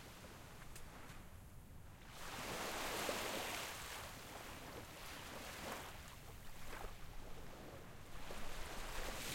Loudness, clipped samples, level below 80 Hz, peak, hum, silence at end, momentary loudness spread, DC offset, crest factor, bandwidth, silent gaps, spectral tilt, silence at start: -49 LUFS; under 0.1%; -56 dBFS; -28 dBFS; none; 0 s; 14 LU; under 0.1%; 20 dB; 16.5 kHz; none; -2.5 dB/octave; 0 s